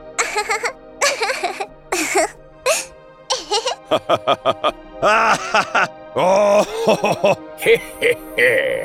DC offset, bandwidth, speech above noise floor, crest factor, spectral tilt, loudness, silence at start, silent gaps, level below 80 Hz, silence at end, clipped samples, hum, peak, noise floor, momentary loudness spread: under 0.1%; 17 kHz; 20 dB; 16 dB; -2.5 dB/octave; -18 LUFS; 0 s; none; -50 dBFS; 0 s; under 0.1%; none; -2 dBFS; -37 dBFS; 9 LU